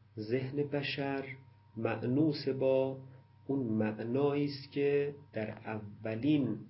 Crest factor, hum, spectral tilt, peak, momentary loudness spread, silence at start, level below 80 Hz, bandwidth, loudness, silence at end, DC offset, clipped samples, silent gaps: 16 dB; none; -6 dB/octave; -18 dBFS; 11 LU; 0.15 s; -70 dBFS; 5.6 kHz; -34 LUFS; 0 s; under 0.1%; under 0.1%; none